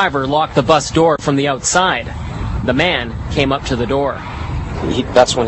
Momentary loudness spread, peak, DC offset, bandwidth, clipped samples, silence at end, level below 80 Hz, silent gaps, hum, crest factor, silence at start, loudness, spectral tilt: 10 LU; 0 dBFS; under 0.1%; 8.6 kHz; under 0.1%; 0 s; -30 dBFS; none; none; 16 dB; 0 s; -16 LUFS; -4.5 dB/octave